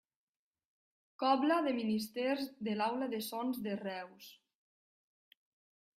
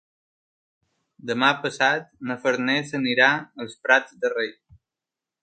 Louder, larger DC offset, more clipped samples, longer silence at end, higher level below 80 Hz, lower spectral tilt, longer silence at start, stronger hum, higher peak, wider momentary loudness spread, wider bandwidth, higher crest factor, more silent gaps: second, -36 LUFS vs -22 LUFS; neither; neither; first, 1.65 s vs 0.9 s; second, -84 dBFS vs -70 dBFS; about the same, -5 dB/octave vs -4 dB/octave; about the same, 1.2 s vs 1.25 s; neither; second, -18 dBFS vs -2 dBFS; about the same, 14 LU vs 12 LU; first, 16 kHz vs 9.2 kHz; about the same, 20 dB vs 24 dB; neither